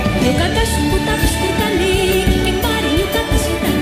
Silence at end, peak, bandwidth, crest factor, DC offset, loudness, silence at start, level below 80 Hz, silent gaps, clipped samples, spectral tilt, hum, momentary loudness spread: 0 s; -2 dBFS; 15.5 kHz; 12 dB; 0.4%; -16 LUFS; 0 s; -22 dBFS; none; under 0.1%; -4.5 dB/octave; none; 2 LU